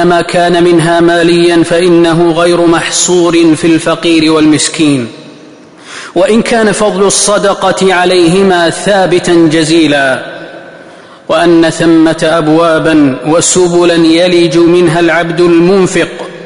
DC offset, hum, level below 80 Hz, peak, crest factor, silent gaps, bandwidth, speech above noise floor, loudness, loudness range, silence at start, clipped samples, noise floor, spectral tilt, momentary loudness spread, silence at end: 0.3%; none; -40 dBFS; 0 dBFS; 8 dB; none; 11 kHz; 26 dB; -7 LUFS; 3 LU; 0 s; under 0.1%; -33 dBFS; -4.5 dB/octave; 4 LU; 0 s